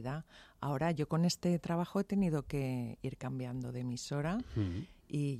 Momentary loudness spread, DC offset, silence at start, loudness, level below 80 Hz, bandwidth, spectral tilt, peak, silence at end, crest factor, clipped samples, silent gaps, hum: 9 LU; under 0.1%; 0 s; -37 LUFS; -58 dBFS; 15 kHz; -6.5 dB/octave; -22 dBFS; 0 s; 14 dB; under 0.1%; none; none